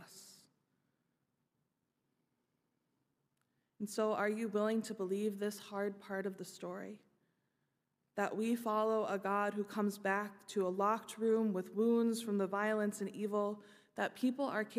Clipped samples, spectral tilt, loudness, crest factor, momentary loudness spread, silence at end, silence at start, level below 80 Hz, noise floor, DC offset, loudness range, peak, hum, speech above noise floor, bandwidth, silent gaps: under 0.1%; -5.5 dB/octave; -37 LUFS; 18 dB; 12 LU; 0 s; 0 s; under -90 dBFS; -85 dBFS; under 0.1%; 7 LU; -20 dBFS; none; 48 dB; 15.5 kHz; none